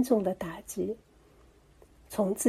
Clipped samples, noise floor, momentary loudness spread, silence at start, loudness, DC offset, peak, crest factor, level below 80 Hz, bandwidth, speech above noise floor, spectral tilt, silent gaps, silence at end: under 0.1%; -59 dBFS; 10 LU; 0 s; -33 LUFS; under 0.1%; -12 dBFS; 18 dB; -60 dBFS; 15.5 kHz; 30 dB; -5.5 dB/octave; none; 0 s